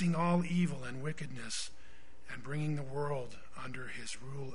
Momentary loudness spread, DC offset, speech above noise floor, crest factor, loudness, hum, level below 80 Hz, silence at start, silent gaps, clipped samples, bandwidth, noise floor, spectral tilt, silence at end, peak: 16 LU; 1%; 21 dB; 18 dB; -38 LUFS; none; -62 dBFS; 0 s; none; under 0.1%; 10.5 kHz; -58 dBFS; -5.5 dB/octave; 0 s; -18 dBFS